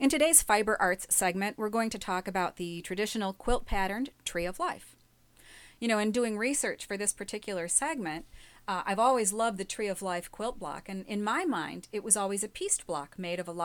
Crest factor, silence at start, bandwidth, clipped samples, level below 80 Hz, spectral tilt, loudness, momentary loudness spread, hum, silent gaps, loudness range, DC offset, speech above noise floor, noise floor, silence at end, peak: 24 dB; 0 s; 19.5 kHz; under 0.1%; -48 dBFS; -2.5 dB/octave; -30 LUFS; 11 LU; none; none; 3 LU; under 0.1%; 31 dB; -61 dBFS; 0 s; -6 dBFS